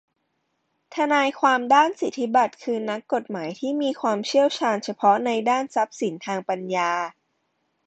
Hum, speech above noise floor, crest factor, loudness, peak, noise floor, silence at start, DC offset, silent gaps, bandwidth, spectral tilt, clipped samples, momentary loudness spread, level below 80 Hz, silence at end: none; 51 dB; 18 dB; -23 LUFS; -6 dBFS; -74 dBFS; 0.9 s; under 0.1%; none; 9 kHz; -4 dB/octave; under 0.1%; 9 LU; -72 dBFS; 0.75 s